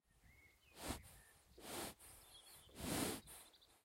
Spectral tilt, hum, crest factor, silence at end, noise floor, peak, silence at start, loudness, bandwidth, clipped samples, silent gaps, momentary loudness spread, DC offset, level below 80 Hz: -3 dB/octave; none; 24 dB; 0.05 s; -70 dBFS; -28 dBFS; 0.15 s; -49 LUFS; 16 kHz; under 0.1%; none; 23 LU; under 0.1%; -66 dBFS